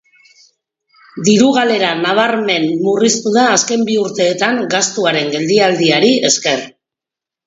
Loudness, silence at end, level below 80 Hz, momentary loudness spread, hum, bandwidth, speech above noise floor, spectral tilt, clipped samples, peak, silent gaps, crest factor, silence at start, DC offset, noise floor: -13 LUFS; 0.75 s; -62 dBFS; 5 LU; none; 8 kHz; 73 dB; -3 dB/octave; under 0.1%; 0 dBFS; none; 14 dB; 1.15 s; under 0.1%; -86 dBFS